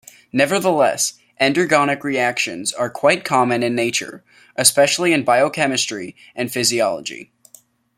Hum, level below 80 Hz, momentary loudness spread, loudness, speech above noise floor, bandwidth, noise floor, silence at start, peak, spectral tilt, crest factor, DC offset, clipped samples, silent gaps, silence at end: none; -64 dBFS; 12 LU; -17 LUFS; 32 dB; 16.5 kHz; -51 dBFS; 0.35 s; 0 dBFS; -3 dB/octave; 18 dB; under 0.1%; under 0.1%; none; 0.75 s